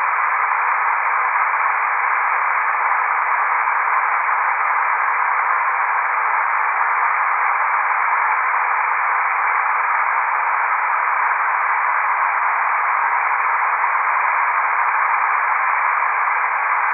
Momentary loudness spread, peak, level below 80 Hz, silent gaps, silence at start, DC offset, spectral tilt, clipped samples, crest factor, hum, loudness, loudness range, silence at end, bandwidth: 1 LU; -4 dBFS; under -90 dBFS; none; 0 s; under 0.1%; -3.5 dB/octave; under 0.1%; 14 dB; none; -17 LUFS; 0 LU; 0 s; 3.3 kHz